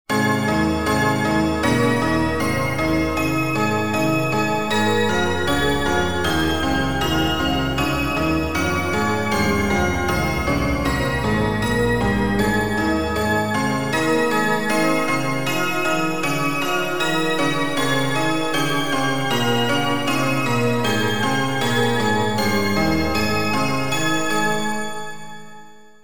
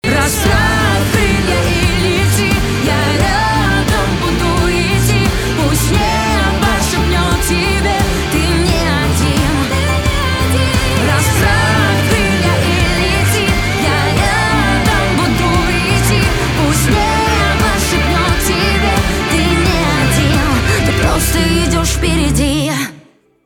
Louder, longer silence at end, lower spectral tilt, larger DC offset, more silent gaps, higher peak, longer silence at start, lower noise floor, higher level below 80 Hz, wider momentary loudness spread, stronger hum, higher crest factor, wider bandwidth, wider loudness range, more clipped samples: second, -20 LUFS vs -13 LUFS; second, 0 s vs 0.45 s; about the same, -5 dB/octave vs -4.5 dB/octave; first, 2% vs under 0.1%; neither; second, -6 dBFS vs 0 dBFS; about the same, 0.05 s vs 0.05 s; about the same, -45 dBFS vs -44 dBFS; second, -38 dBFS vs -20 dBFS; about the same, 2 LU vs 2 LU; neither; about the same, 14 dB vs 12 dB; about the same, 19.5 kHz vs 20 kHz; about the same, 1 LU vs 1 LU; neither